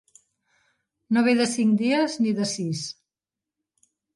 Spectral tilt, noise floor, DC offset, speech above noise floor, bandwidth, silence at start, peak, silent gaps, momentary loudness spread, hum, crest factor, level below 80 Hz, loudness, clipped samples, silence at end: -4.5 dB/octave; -89 dBFS; under 0.1%; 67 dB; 11.5 kHz; 1.1 s; -8 dBFS; none; 11 LU; none; 18 dB; -72 dBFS; -23 LUFS; under 0.1%; 1.25 s